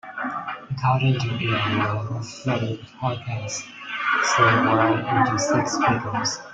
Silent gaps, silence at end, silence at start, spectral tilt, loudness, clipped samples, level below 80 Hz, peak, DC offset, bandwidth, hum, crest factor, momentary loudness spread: none; 0 s; 0.05 s; -4.5 dB/octave; -22 LUFS; under 0.1%; -56 dBFS; -6 dBFS; under 0.1%; 9.2 kHz; none; 18 dB; 13 LU